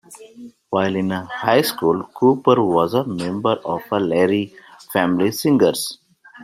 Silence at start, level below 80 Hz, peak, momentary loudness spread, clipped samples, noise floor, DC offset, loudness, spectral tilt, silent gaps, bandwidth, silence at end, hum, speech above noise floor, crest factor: 0.1 s; -60 dBFS; -2 dBFS; 8 LU; under 0.1%; -41 dBFS; under 0.1%; -19 LUFS; -5.5 dB/octave; none; 16 kHz; 0 s; none; 23 dB; 18 dB